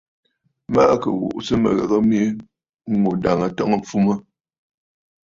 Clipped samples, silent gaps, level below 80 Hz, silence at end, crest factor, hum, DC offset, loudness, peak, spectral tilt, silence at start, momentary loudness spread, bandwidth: under 0.1%; 2.69-2.79 s; -50 dBFS; 1.2 s; 18 dB; none; under 0.1%; -19 LUFS; -2 dBFS; -7 dB/octave; 0.7 s; 8 LU; 7.6 kHz